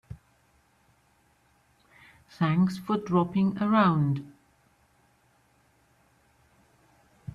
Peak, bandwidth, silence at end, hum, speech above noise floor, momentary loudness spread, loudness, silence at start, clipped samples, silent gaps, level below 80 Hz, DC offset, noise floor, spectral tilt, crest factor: -12 dBFS; 10.5 kHz; 0 s; none; 41 dB; 25 LU; -26 LUFS; 0.1 s; under 0.1%; none; -64 dBFS; under 0.1%; -66 dBFS; -8.5 dB/octave; 18 dB